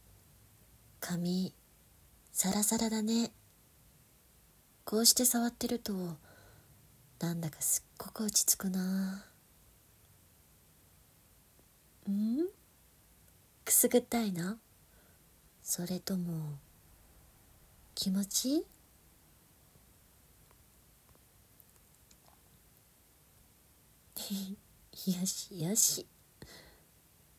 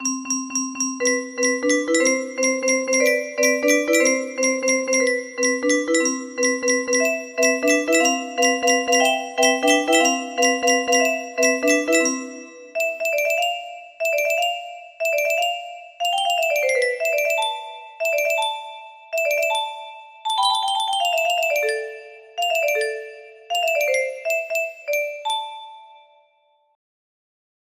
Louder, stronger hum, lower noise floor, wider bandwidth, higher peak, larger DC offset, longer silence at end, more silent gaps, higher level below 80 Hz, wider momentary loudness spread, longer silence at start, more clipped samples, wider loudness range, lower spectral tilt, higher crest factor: second, -32 LUFS vs -20 LUFS; neither; about the same, -65 dBFS vs -63 dBFS; about the same, 16 kHz vs 15.5 kHz; second, -10 dBFS vs -4 dBFS; neither; second, 0.7 s vs 1.9 s; neither; about the same, -68 dBFS vs -72 dBFS; first, 20 LU vs 12 LU; first, 1 s vs 0 s; neither; first, 10 LU vs 5 LU; first, -3.5 dB/octave vs 0.5 dB/octave; first, 26 dB vs 18 dB